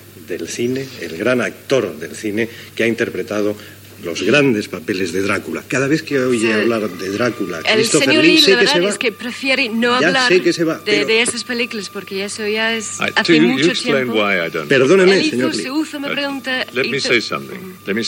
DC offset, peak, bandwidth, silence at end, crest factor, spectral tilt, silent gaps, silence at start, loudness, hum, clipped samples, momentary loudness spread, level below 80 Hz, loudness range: under 0.1%; 0 dBFS; 17 kHz; 0 s; 16 dB; -3.5 dB/octave; none; 0 s; -16 LUFS; none; under 0.1%; 12 LU; -64 dBFS; 6 LU